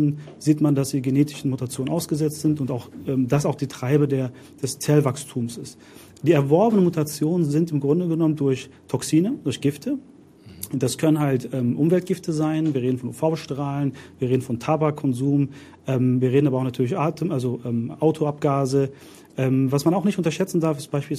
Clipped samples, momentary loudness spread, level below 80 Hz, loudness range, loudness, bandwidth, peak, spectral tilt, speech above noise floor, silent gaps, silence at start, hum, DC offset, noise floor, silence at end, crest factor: under 0.1%; 9 LU; -62 dBFS; 3 LU; -23 LUFS; 15.5 kHz; -6 dBFS; -7 dB/octave; 24 dB; none; 0 s; none; under 0.1%; -46 dBFS; 0 s; 16 dB